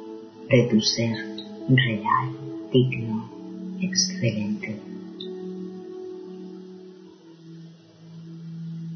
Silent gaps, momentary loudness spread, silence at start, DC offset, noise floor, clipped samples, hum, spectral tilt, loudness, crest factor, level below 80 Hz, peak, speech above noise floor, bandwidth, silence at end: none; 22 LU; 0 s; under 0.1%; -47 dBFS; under 0.1%; none; -5 dB/octave; -25 LUFS; 22 dB; -62 dBFS; -6 dBFS; 25 dB; 6.6 kHz; 0 s